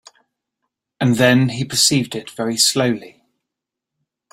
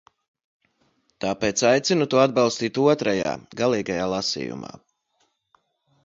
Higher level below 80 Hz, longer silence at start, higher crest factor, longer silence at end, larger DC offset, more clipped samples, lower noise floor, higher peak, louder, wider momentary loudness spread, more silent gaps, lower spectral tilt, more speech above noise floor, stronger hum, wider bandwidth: about the same, -56 dBFS vs -58 dBFS; second, 1 s vs 1.2 s; about the same, 18 dB vs 20 dB; about the same, 1.25 s vs 1.35 s; neither; neither; first, -83 dBFS vs -70 dBFS; first, 0 dBFS vs -4 dBFS; first, -16 LUFS vs -22 LUFS; about the same, 11 LU vs 11 LU; neither; about the same, -3.5 dB/octave vs -4 dB/octave; first, 66 dB vs 48 dB; neither; first, 16 kHz vs 7.8 kHz